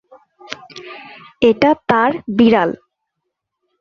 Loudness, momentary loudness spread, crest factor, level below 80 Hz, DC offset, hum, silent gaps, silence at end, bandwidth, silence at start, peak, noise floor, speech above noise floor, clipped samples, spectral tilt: -14 LUFS; 21 LU; 18 dB; -52 dBFS; under 0.1%; none; none; 1.1 s; 7 kHz; 0.5 s; 0 dBFS; -76 dBFS; 63 dB; under 0.1%; -6.5 dB/octave